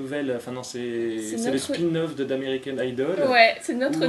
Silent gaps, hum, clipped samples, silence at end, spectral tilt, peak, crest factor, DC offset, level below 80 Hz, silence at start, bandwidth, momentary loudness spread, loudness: none; none; under 0.1%; 0 s; -4.5 dB/octave; 0 dBFS; 24 dB; under 0.1%; -68 dBFS; 0 s; 13 kHz; 12 LU; -24 LUFS